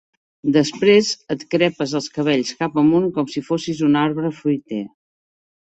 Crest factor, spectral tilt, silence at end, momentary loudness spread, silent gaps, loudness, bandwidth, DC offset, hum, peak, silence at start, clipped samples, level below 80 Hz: 18 dB; -5.5 dB/octave; 0.9 s; 10 LU; none; -19 LUFS; 8.2 kHz; under 0.1%; none; -2 dBFS; 0.45 s; under 0.1%; -60 dBFS